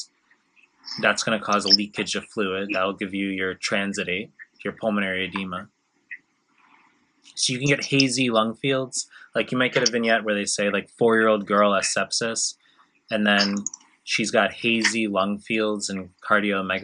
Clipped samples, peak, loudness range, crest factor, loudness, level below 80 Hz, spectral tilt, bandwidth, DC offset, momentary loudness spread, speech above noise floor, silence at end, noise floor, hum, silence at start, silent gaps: under 0.1%; -2 dBFS; 6 LU; 24 dB; -23 LUFS; -72 dBFS; -3 dB/octave; 11 kHz; under 0.1%; 14 LU; 41 dB; 0 s; -64 dBFS; none; 0 s; none